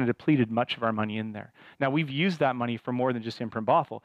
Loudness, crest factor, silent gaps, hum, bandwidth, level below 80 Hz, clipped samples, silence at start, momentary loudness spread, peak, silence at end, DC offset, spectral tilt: -28 LUFS; 16 dB; none; none; 9 kHz; -70 dBFS; under 0.1%; 0 s; 8 LU; -12 dBFS; 0.05 s; under 0.1%; -7.5 dB/octave